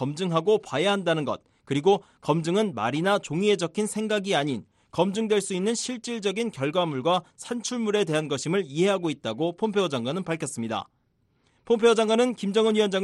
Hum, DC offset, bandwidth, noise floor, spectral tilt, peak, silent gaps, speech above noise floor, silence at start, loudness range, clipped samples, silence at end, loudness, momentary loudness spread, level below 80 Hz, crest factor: none; under 0.1%; 12.5 kHz; -69 dBFS; -5 dB/octave; -8 dBFS; none; 44 dB; 0 s; 2 LU; under 0.1%; 0 s; -25 LUFS; 8 LU; -68 dBFS; 18 dB